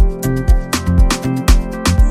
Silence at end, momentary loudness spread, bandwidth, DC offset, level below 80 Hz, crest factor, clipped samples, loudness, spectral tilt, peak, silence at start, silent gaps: 0 s; 2 LU; 15.5 kHz; under 0.1%; -14 dBFS; 12 dB; under 0.1%; -15 LUFS; -5.5 dB/octave; 0 dBFS; 0 s; none